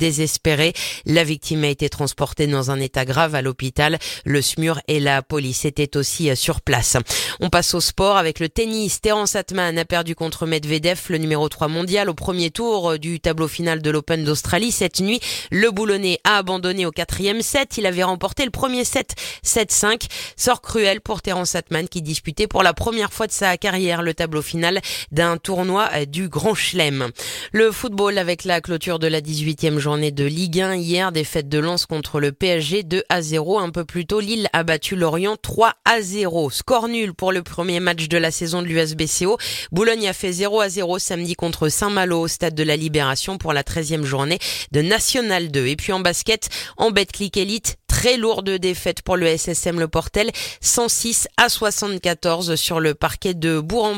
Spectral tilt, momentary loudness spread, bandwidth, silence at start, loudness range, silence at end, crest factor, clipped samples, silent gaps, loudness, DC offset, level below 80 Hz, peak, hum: -3.5 dB/octave; 6 LU; 17 kHz; 0 s; 2 LU; 0 s; 20 dB; under 0.1%; none; -20 LUFS; under 0.1%; -40 dBFS; 0 dBFS; none